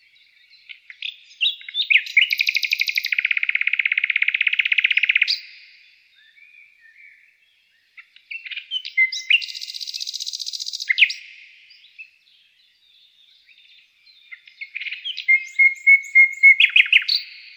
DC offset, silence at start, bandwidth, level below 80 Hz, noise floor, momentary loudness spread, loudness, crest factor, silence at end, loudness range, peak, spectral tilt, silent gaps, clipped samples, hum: under 0.1%; 0.7 s; over 20 kHz; -82 dBFS; -61 dBFS; 19 LU; -17 LUFS; 20 dB; 0.05 s; 12 LU; -2 dBFS; 7 dB/octave; none; under 0.1%; none